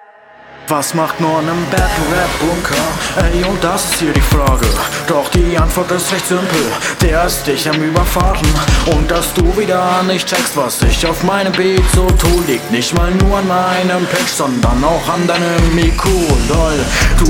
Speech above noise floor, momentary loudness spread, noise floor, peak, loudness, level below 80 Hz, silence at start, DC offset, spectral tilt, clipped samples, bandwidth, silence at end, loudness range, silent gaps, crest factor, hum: 27 dB; 3 LU; -39 dBFS; 0 dBFS; -13 LUFS; -18 dBFS; 0.45 s; under 0.1%; -4.5 dB/octave; under 0.1%; 19 kHz; 0 s; 1 LU; none; 12 dB; none